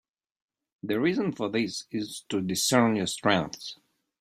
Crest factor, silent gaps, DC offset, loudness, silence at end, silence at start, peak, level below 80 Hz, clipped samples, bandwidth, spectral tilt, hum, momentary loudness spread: 22 dB; none; under 0.1%; -27 LUFS; 0.45 s; 0.85 s; -6 dBFS; -66 dBFS; under 0.1%; 16 kHz; -4 dB/octave; none; 13 LU